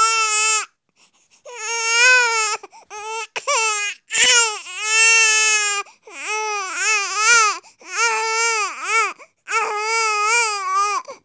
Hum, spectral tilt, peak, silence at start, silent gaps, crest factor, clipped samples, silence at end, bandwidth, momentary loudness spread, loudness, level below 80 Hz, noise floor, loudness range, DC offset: none; 4 dB/octave; -2 dBFS; 0 s; none; 18 dB; under 0.1%; 0.1 s; 8 kHz; 16 LU; -16 LUFS; -70 dBFS; -59 dBFS; 3 LU; under 0.1%